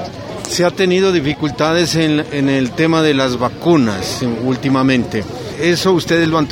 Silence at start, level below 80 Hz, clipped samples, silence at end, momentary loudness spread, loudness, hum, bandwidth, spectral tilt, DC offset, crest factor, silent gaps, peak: 0 s; -44 dBFS; under 0.1%; 0 s; 6 LU; -15 LUFS; none; 16.5 kHz; -5 dB/octave; under 0.1%; 14 dB; none; 0 dBFS